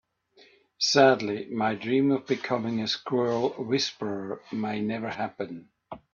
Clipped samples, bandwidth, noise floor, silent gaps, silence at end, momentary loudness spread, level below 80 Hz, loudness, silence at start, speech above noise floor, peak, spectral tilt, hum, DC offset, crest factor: under 0.1%; 7.4 kHz; -59 dBFS; none; 0.15 s; 14 LU; -70 dBFS; -27 LUFS; 0.8 s; 33 dB; -6 dBFS; -4.5 dB/octave; none; under 0.1%; 22 dB